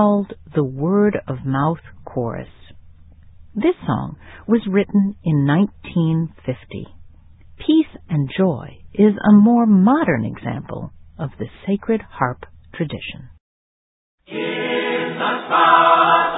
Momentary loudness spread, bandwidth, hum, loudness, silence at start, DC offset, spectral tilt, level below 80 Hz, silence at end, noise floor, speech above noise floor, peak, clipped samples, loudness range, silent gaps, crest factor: 19 LU; 4 kHz; none; -18 LUFS; 0 s; under 0.1%; -11.5 dB/octave; -48 dBFS; 0 s; -44 dBFS; 26 dB; 0 dBFS; under 0.1%; 9 LU; 13.40-14.18 s; 18 dB